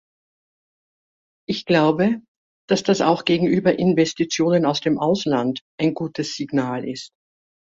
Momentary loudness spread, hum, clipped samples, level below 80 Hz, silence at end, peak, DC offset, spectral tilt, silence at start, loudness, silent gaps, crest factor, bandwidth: 10 LU; none; under 0.1%; -60 dBFS; 0.6 s; -2 dBFS; under 0.1%; -5.5 dB/octave; 1.5 s; -20 LUFS; 2.28-2.68 s, 5.61-5.78 s; 18 dB; 7.8 kHz